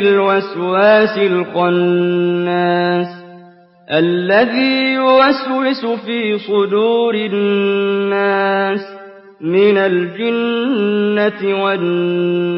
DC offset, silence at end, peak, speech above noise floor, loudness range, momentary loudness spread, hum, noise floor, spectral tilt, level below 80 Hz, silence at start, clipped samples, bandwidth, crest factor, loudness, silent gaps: under 0.1%; 0 s; -2 dBFS; 29 dB; 2 LU; 7 LU; none; -43 dBFS; -11 dB/octave; -66 dBFS; 0 s; under 0.1%; 5.8 kHz; 12 dB; -14 LUFS; none